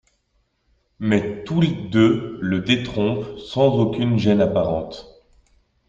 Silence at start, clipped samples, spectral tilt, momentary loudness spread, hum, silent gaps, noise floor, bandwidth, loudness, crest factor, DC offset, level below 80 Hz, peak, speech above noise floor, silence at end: 1 s; under 0.1%; -7.5 dB/octave; 10 LU; none; none; -67 dBFS; 7.8 kHz; -20 LUFS; 18 dB; under 0.1%; -50 dBFS; -4 dBFS; 48 dB; 0.8 s